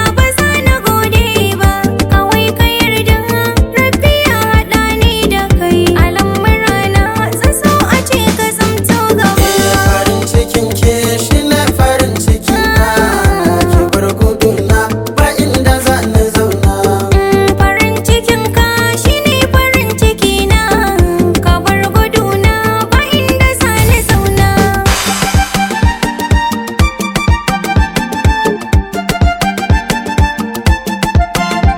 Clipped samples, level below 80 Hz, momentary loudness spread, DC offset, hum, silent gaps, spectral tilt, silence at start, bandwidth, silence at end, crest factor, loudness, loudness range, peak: 0.2%; -18 dBFS; 4 LU; under 0.1%; none; none; -5 dB/octave; 0 s; 19.5 kHz; 0 s; 10 dB; -11 LUFS; 3 LU; 0 dBFS